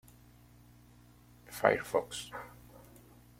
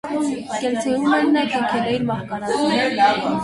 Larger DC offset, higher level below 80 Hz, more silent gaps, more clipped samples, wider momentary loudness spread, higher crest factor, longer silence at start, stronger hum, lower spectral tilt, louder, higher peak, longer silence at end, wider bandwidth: neither; second, -64 dBFS vs -56 dBFS; neither; neither; first, 26 LU vs 7 LU; first, 30 dB vs 14 dB; first, 1.5 s vs 0.05 s; first, 60 Hz at -60 dBFS vs none; about the same, -4 dB/octave vs -5 dB/octave; second, -33 LUFS vs -20 LUFS; second, -8 dBFS vs -4 dBFS; first, 0.6 s vs 0 s; first, 16.5 kHz vs 11.5 kHz